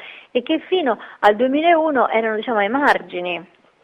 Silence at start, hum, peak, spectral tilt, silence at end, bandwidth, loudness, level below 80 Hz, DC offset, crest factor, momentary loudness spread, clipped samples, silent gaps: 0 s; none; -2 dBFS; -5.5 dB/octave; 0.4 s; 10 kHz; -18 LUFS; -62 dBFS; under 0.1%; 18 dB; 10 LU; under 0.1%; none